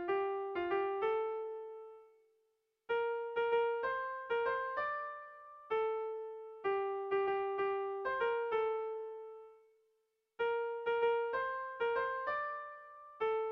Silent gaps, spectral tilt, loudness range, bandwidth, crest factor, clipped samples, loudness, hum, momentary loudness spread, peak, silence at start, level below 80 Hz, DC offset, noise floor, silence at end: none; -6 dB/octave; 2 LU; 5.4 kHz; 14 dB; under 0.1%; -37 LUFS; none; 14 LU; -24 dBFS; 0 s; -76 dBFS; under 0.1%; -80 dBFS; 0 s